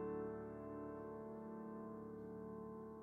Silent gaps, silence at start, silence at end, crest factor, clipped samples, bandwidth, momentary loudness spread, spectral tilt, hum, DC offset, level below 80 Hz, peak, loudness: none; 0 s; 0 s; 12 dB; under 0.1%; 3.8 kHz; 4 LU; -10 dB/octave; none; under 0.1%; -72 dBFS; -38 dBFS; -51 LUFS